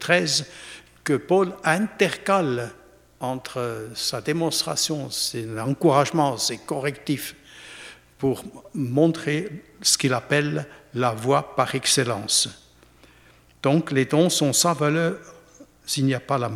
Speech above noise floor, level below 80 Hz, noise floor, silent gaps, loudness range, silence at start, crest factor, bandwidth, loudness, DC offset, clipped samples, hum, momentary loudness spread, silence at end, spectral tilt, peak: 31 dB; -60 dBFS; -54 dBFS; none; 4 LU; 0 s; 22 dB; 16.5 kHz; -23 LUFS; under 0.1%; under 0.1%; none; 15 LU; 0 s; -4 dB/octave; -2 dBFS